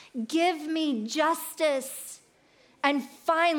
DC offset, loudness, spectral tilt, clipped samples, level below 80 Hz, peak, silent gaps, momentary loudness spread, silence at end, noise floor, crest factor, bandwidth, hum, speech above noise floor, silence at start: under 0.1%; -28 LUFS; -2.5 dB/octave; under 0.1%; -82 dBFS; -10 dBFS; none; 11 LU; 0 s; -61 dBFS; 20 dB; 19 kHz; none; 34 dB; 0 s